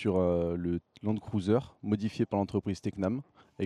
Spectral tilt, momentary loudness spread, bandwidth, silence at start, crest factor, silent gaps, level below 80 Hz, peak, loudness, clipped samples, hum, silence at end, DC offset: -8 dB/octave; 6 LU; 10.5 kHz; 0 s; 16 dB; none; -62 dBFS; -14 dBFS; -32 LUFS; under 0.1%; none; 0 s; under 0.1%